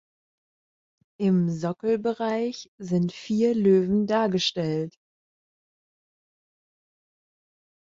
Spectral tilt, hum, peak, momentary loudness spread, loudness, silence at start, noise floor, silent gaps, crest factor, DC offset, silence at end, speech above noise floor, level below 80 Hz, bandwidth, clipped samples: -6.5 dB/octave; none; -10 dBFS; 8 LU; -25 LUFS; 1.2 s; under -90 dBFS; 2.68-2.78 s; 18 dB; under 0.1%; 3.05 s; over 66 dB; -66 dBFS; 7.6 kHz; under 0.1%